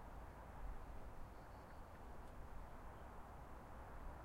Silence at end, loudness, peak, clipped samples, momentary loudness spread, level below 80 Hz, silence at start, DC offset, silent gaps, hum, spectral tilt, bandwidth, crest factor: 0 s; -58 LUFS; -40 dBFS; under 0.1%; 3 LU; -56 dBFS; 0 s; under 0.1%; none; none; -6.5 dB/octave; 16 kHz; 14 dB